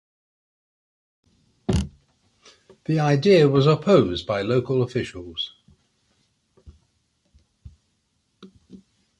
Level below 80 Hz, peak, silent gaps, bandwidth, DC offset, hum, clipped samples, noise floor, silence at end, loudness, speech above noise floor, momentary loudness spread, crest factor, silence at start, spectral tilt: -44 dBFS; -4 dBFS; none; 11.5 kHz; under 0.1%; none; under 0.1%; -71 dBFS; 0.45 s; -21 LUFS; 51 dB; 16 LU; 20 dB; 1.7 s; -7 dB/octave